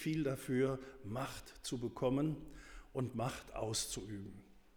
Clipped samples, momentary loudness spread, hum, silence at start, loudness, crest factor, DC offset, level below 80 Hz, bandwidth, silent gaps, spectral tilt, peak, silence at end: under 0.1%; 13 LU; none; 0 s; -40 LUFS; 18 dB; under 0.1%; -60 dBFS; over 20 kHz; none; -5 dB/octave; -24 dBFS; 0.15 s